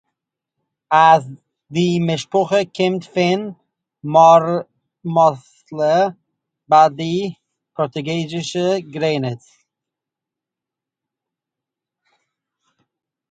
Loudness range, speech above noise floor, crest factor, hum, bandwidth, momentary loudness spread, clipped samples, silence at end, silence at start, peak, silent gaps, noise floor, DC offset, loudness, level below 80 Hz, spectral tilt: 9 LU; 70 dB; 18 dB; none; 9.2 kHz; 17 LU; under 0.1%; 3.95 s; 0.9 s; 0 dBFS; none; -86 dBFS; under 0.1%; -17 LUFS; -64 dBFS; -6 dB/octave